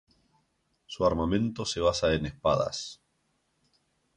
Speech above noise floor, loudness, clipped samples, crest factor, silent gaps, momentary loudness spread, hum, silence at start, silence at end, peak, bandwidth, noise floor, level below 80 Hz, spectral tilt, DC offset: 47 dB; -28 LUFS; under 0.1%; 20 dB; none; 11 LU; none; 0.9 s; 1.25 s; -12 dBFS; 10.5 kHz; -74 dBFS; -48 dBFS; -5 dB/octave; under 0.1%